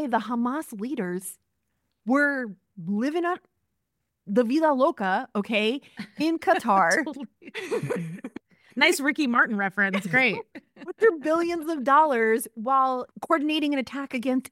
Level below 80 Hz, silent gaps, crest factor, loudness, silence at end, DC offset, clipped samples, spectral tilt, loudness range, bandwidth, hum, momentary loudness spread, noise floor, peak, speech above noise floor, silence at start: -74 dBFS; none; 20 dB; -24 LUFS; 0.1 s; under 0.1%; under 0.1%; -4.5 dB/octave; 5 LU; 16.5 kHz; none; 16 LU; -80 dBFS; -6 dBFS; 55 dB; 0 s